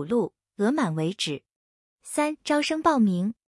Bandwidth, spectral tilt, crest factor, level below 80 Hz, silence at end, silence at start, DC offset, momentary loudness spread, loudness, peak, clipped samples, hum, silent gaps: 12 kHz; -5 dB/octave; 18 dB; -66 dBFS; 0.2 s; 0 s; under 0.1%; 9 LU; -25 LUFS; -8 dBFS; under 0.1%; none; 1.56-1.98 s